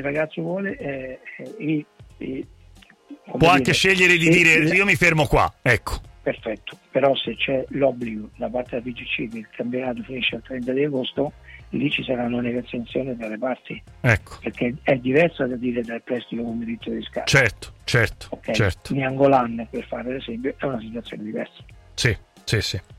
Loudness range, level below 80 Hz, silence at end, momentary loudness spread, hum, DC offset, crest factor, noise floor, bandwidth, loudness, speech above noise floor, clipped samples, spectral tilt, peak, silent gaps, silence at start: 10 LU; -44 dBFS; 0.05 s; 16 LU; none; under 0.1%; 18 dB; -50 dBFS; 16 kHz; -22 LUFS; 27 dB; under 0.1%; -5 dB/octave; -4 dBFS; none; 0 s